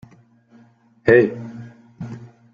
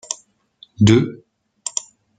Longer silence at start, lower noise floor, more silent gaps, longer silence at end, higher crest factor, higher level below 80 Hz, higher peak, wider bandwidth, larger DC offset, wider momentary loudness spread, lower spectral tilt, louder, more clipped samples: first, 1.05 s vs 0.1 s; about the same, -53 dBFS vs -51 dBFS; neither; second, 0.3 s vs 0.5 s; about the same, 20 dB vs 18 dB; about the same, -56 dBFS vs -52 dBFS; about the same, -2 dBFS vs -2 dBFS; second, 7 kHz vs 9.6 kHz; neither; first, 24 LU vs 16 LU; first, -8.5 dB/octave vs -5.5 dB/octave; about the same, -17 LUFS vs -19 LUFS; neither